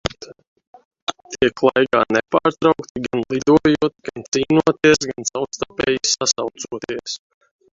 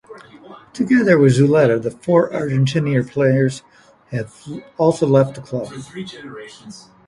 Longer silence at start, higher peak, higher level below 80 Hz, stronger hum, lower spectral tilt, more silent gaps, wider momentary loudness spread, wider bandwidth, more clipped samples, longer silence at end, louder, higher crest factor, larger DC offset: about the same, 0.05 s vs 0.1 s; about the same, 0 dBFS vs 0 dBFS; first, -50 dBFS vs -56 dBFS; neither; second, -3.5 dB/octave vs -7.5 dB/octave; first, 0.47-0.56 s, 0.67-0.73 s, 0.85-0.91 s, 1.02-1.07 s, 2.89-2.95 s, 4.28-4.32 s vs none; second, 14 LU vs 21 LU; second, 8 kHz vs 11.5 kHz; neither; first, 0.55 s vs 0.3 s; about the same, -19 LUFS vs -17 LUFS; about the same, 20 dB vs 18 dB; neither